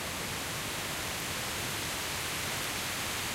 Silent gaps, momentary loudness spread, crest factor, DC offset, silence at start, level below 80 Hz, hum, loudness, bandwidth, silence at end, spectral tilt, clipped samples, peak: none; 2 LU; 14 dB; under 0.1%; 0 s; -54 dBFS; none; -33 LUFS; 16 kHz; 0 s; -2 dB/octave; under 0.1%; -20 dBFS